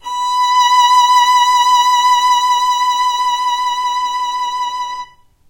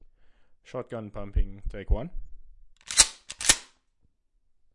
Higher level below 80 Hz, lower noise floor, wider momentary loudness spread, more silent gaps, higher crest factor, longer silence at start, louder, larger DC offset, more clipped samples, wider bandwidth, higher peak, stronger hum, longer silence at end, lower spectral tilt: second, -56 dBFS vs -34 dBFS; second, -34 dBFS vs -68 dBFS; second, 10 LU vs 19 LU; neither; second, 12 dB vs 28 dB; second, 0.05 s vs 0.7 s; first, -12 LUFS vs -25 LUFS; neither; neither; first, 16 kHz vs 11.5 kHz; about the same, -2 dBFS vs -2 dBFS; neither; second, 0.45 s vs 1.1 s; second, 3.5 dB/octave vs -1 dB/octave